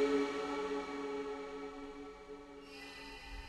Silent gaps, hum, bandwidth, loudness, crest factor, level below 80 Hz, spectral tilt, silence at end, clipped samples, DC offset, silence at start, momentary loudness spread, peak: none; none; 12.5 kHz; -42 LUFS; 18 dB; -60 dBFS; -4.5 dB/octave; 0 s; under 0.1%; under 0.1%; 0 s; 15 LU; -22 dBFS